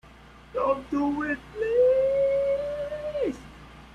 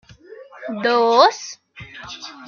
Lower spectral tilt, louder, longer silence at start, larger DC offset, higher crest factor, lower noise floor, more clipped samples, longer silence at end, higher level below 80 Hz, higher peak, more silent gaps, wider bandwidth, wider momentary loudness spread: first, -6.5 dB/octave vs -3 dB/octave; second, -26 LUFS vs -16 LUFS; second, 0.05 s vs 0.3 s; neither; second, 14 dB vs 20 dB; first, -50 dBFS vs -42 dBFS; neither; about the same, 0.05 s vs 0 s; first, -52 dBFS vs -62 dBFS; second, -12 dBFS vs 0 dBFS; neither; first, 9.6 kHz vs 7.2 kHz; second, 11 LU vs 23 LU